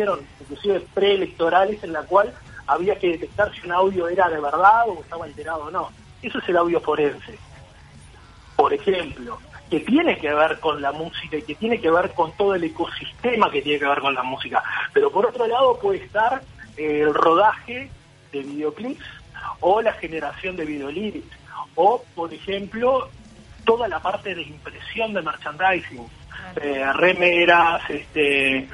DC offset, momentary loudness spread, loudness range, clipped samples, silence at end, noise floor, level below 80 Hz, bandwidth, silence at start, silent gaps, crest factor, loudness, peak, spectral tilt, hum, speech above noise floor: under 0.1%; 16 LU; 5 LU; under 0.1%; 0 s; -46 dBFS; -50 dBFS; 11.5 kHz; 0 s; none; 20 dB; -21 LUFS; -2 dBFS; -5.5 dB/octave; none; 24 dB